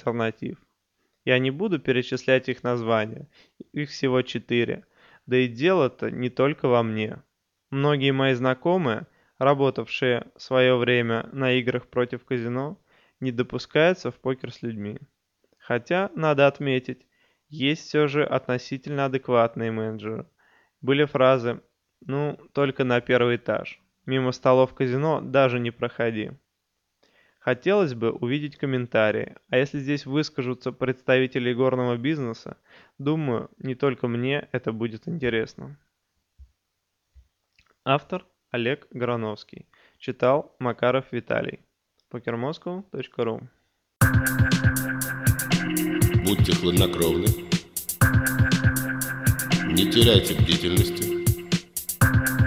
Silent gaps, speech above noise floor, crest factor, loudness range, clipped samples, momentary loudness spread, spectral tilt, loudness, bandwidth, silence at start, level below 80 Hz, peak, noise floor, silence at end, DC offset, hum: none; 54 dB; 24 dB; 7 LU; under 0.1%; 13 LU; -5.5 dB/octave; -24 LUFS; 16.5 kHz; 0.05 s; -42 dBFS; 0 dBFS; -78 dBFS; 0 s; under 0.1%; none